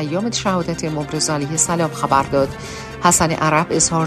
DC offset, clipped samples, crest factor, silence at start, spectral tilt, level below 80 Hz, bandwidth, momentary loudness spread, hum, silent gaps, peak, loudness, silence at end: under 0.1%; under 0.1%; 18 dB; 0 s; -3.5 dB/octave; -42 dBFS; 14 kHz; 8 LU; none; none; 0 dBFS; -18 LUFS; 0 s